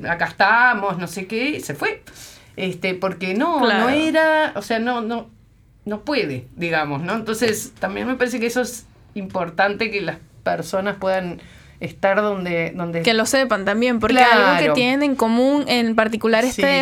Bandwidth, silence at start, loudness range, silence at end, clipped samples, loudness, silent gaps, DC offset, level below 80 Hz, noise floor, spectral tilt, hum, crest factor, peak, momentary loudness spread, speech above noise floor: 18.5 kHz; 0 s; 7 LU; 0 s; under 0.1%; -19 LUFS; none; under 0.1%; -52 dBFS; -51 dBFS; -4 dB/octave; none; 18 dB; 0 dBFS; 13 LU; 32 dB